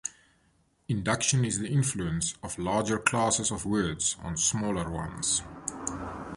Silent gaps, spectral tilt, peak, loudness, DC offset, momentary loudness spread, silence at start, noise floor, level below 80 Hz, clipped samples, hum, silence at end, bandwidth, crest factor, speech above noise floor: none; -3.5 dB/octave; -6 dBFS; -28 LUFS; under 0.1%; 9 LU; 0.05 s; -68 dBFS; -50 dBFS; under 0.1%; none; 0 s; 11.5 kHz; 24 dB; 39 dB